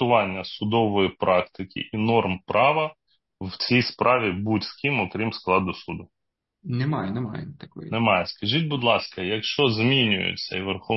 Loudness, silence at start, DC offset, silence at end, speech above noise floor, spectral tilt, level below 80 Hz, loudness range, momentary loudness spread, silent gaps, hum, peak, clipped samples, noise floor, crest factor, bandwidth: -23 LUFS; 0 s; under 0.1%; 0 s; 41 dB; -7 dB/octave; -62 dBFS; 4 LU; 13 LU; none; none; -4 dBFS; under 0.1%; -64 dBFS; 20 dB; 6 kHz